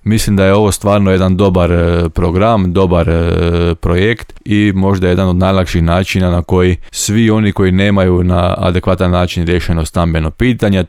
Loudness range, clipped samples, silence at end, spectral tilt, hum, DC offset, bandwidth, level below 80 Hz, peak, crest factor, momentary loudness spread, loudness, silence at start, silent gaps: 1 LU; under 0.1%; 0 s; -6.5 dB/octave; none; under 0.1%; 15 kHz; -26 dBFS; -2 dBFS; 10 dB; 4 LU; -12 LUFS; 0.05 s; none